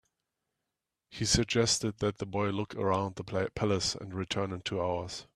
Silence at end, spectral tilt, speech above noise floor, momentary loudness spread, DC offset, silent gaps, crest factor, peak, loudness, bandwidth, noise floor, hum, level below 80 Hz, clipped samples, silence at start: 0.15 s; -4 dB/octave; 56 dB; 8 LU; under 0.1%; none; 22 dB; -12 dBFS; -31 LUFS; 14 kHz; -87 dBFS; none; -54 dBFS; under 0.1%; 1.1 s